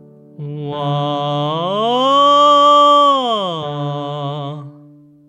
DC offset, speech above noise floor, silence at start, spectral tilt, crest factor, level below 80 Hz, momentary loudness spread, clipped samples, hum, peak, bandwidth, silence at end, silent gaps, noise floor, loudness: under 0.1%; 24 dB; 0.4 s; -5.5 dB/octave; 14 dB; -70 dBFS; 18 LU; under 0.1%; none; -2 dBFS; 9.4 kHz; 0.55 s; none; -44 dBFS; -14 LUFS